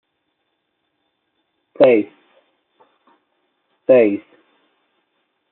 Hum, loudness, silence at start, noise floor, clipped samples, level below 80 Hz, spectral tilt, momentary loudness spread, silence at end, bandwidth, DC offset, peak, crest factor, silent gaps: none; -15 LUFS; 1.8 s; -72 dBFS; under 0.1%; -76 dBFS; -5 dB/octave; 15 LU; 1.3 s; 4.2 kHz; under 0.1%; -2 dBFS; 20 dB; none